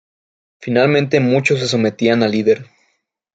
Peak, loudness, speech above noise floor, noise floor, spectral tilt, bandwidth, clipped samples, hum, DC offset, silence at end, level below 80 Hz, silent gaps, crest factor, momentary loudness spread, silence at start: -2 dBFS; -15 LUFS; 52 dB; -67 dBFS; -6 dB/octave; 9.2 kHz; under 0.1%; none; under 0.1%; 0.7 s; -60 dBFS; none; 14 dB; 5 LU; 0.6 s